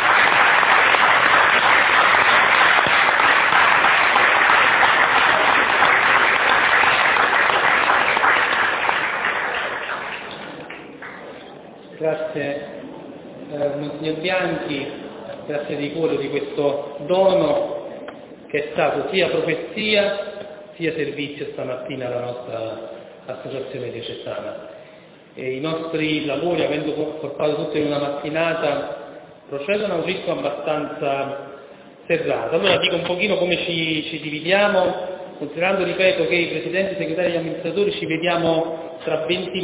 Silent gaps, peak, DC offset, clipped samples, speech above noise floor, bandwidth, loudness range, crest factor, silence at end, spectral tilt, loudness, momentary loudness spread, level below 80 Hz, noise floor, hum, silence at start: none; -2 dBFS; under 0.1%; under 0.1%; 23 dB; 4 kHz; 14 LU; 18 dB; 0 s; -7.5 dB/octave; -18 LUFS; 19 LU; -56 dBFS; -45 dBFS; none; 0 s